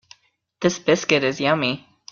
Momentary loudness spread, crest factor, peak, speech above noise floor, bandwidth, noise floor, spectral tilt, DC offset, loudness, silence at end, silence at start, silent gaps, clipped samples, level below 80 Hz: 6 LU; 20 dB; -2 dBFS; 33 dB; 7.4 kHz; -53 dBFS; -4 dB/octave; under 0.1%; -20 LUFS; 0.35 s; 0.6 s; none; under 0.1%; -60 dBFS